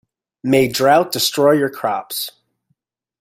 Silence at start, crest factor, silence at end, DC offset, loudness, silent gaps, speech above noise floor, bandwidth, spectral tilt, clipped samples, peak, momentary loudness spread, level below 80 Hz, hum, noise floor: 0.45 s; 16 dB; 0.9 s; under 0.1%; -16 LUFS; none; 53 dB; 16.5 kHz; -4 dB/octave; under 0.1%; -2 dBFS; 11 LU; -56 dBFS; none; -69 dBFS